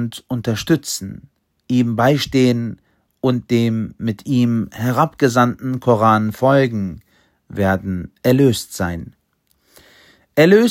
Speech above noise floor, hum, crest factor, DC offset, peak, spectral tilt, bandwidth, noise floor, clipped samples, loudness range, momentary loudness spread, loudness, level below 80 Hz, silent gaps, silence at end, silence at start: 47 dB; none; 18 dB; under 0.1%; 0 dBFS; -6 dB/octave; 16.5 kHz; -63 dBFS; under 0.1%; 4 LU; 11 LU; -17 LUFS; -48 dBFS; none; 0 s; 0 s